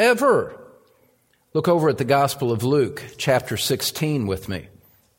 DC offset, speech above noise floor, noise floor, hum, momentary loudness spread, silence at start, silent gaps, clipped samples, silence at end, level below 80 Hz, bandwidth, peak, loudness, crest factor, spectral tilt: under 0.1%; 41 dB; -62 dBFS; none; 9 LU; 0 s; none; under 0.1%; 0.55 s; -54 dBFS; 17 kHz; -4 dBFS; -21 LUFS; 18 dB; -5 dB/octave